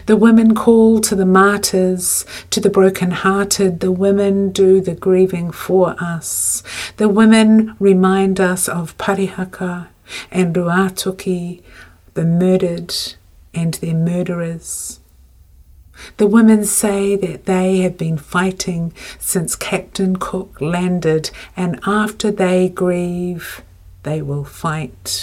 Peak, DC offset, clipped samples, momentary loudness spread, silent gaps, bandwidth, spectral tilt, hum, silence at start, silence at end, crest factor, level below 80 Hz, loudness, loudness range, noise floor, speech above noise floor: 0 dBFS; under 0.1%; under 0.1%; 13 LU; none; 16 kHz; -5 dB/octave; none; 0 s; 0 s; 16 dB; -46 dBFS; -16 LUFS; 6 LU; -46 dBFS; 31 dB